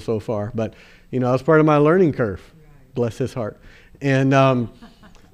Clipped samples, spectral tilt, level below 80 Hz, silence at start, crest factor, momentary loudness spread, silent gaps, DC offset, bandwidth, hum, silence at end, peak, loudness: under 0.1%; -8 dB/octave; -48 dBFS; 0 s; 16 dB; 15 LU; none; under 0.1%; 10.5 kHz; none; 0.5 s; -4 dBFS; -19 LUFS